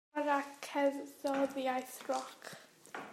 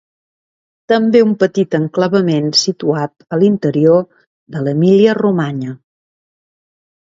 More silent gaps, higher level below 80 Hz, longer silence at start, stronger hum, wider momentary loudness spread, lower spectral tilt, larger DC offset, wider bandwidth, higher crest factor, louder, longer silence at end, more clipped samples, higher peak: second, none vs 4.27-4.46 s; second, -88 dBFS vs -60 dBFS; second, 0.15 s vs 0.9 s; neither; first, 15 LU vs 10 LU; second, -3 dB/octave vs -6 dB/octave; neither; first, 16 kHz vs 7.8 kHz; about the same, 18 dB vs 14 dB; second, -37 LUFS vs -14 LUFS; second, 0 s vs 1.25 s; neither; second, -18 dBFS vs 0 dBFS